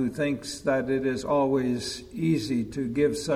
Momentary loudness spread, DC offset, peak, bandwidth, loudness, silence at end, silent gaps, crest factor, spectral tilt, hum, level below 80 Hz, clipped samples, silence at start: 5 LU; under 0.1%; -12 dBFS; 15.5 kHz; -27 LUFS; 0 s; none; 14 dB; -5.5 dB/octave; none; -54 dBFS; under 0.1%; 0 s